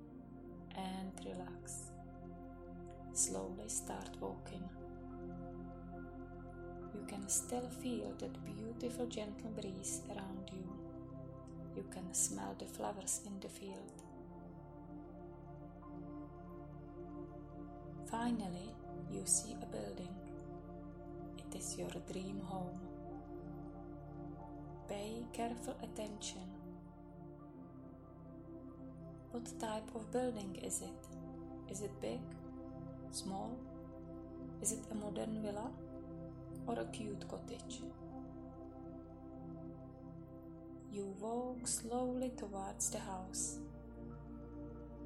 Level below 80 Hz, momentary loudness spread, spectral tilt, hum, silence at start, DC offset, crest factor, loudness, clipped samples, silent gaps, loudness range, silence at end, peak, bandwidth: -60 dBFS; 14 LU; -4 dB/octave; none; 0 s; under 0.1%; 26 dB; -45 LUFS; under 0.1%; none; 9 LU; 0 s; -20 dBFS; 16 kHz